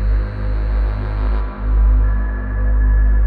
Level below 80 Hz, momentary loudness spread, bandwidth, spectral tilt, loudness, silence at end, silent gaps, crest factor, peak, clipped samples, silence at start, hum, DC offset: -16 dBFS; 6 LU; 4.3 kHz; -10.5 dB/octave; -19 LUFS; 0 s; none; 8 dB; -6 dBFS; under 0.1%; 0 s; 50 Hz at -20 dBFS; under 0.1%